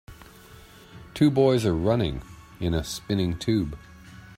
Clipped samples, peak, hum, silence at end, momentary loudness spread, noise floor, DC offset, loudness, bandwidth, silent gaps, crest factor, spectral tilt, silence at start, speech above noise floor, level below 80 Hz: under 0.1%; -8 dBFS; none; 0 s; 15 LU; -49 dBFS; under 0.1%; -25 LUFS; 16 kHz; none; 18 dB; -6.5 dB/octave; 0.1 s; 25 dB; -44 dBFS